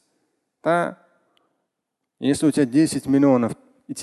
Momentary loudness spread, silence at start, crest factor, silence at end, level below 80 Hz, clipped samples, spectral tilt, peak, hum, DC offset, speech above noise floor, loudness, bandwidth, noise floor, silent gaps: 12 LU; 0.65 s; 18 dB; 0 s; -60 dBFS; under 0.1%; -6 dB/octave; -4 dBFS; none; under 0.1%; 62 dB; -20 LUFS; 12.5 kHz; -80 dBFS; none